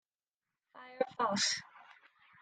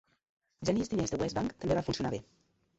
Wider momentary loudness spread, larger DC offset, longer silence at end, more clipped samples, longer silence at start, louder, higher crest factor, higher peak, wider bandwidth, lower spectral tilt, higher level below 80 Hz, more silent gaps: first, 24 LU vs 6 LU; neither; about the same, 0.5 s vs 0.55 s; neither; first, 0.75 s vs 0.6 s; about the same, -34 LUFS vs -34 LUFS; about the same, 22 dB vs 18 dB; about the same, -16 dBFS vs -16 dBFS; first, 11 kHz vs 8.2 kHz; second, -2 dB/octave vs -5.5 dB/octave; second, -84 dBFS vs -54 dBFS; neither